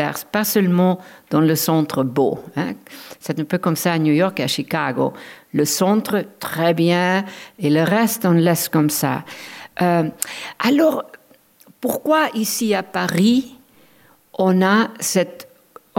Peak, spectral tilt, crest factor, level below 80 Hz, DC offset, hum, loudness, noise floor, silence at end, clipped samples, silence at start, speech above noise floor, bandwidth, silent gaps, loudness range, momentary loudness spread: -2 dBFS; -5 dB/octave; 18 dB; -66 dBFS; under 0.1%; none; -19 LUFS; -53 dBFS; 0.55 s; under 0.1%; 0 s; 35 dB; 17 kHz; none; 3 LU; 11 LU